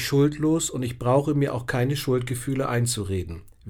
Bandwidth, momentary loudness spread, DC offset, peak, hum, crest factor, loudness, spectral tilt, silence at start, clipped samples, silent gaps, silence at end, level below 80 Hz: 17.5 kHz; 6 LU; under 0.1%; -8 dBFS; none; 16 dB; -24 LUFS; -5.5 dB/octave; 0 s; under 0.1%; none; 0 s; -48 dBFS